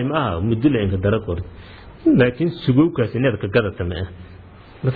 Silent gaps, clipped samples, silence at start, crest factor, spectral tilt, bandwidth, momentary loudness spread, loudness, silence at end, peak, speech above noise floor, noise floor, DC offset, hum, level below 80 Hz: none; under 0.1%; 0 s; 16 dB; -11 dB/octave; 4.9 kHz; 13 LU; -19 LUFS; 0 s; -4 dBFS; 23 dB; -42 dBFS; under 0.1%; none; -40 dBFS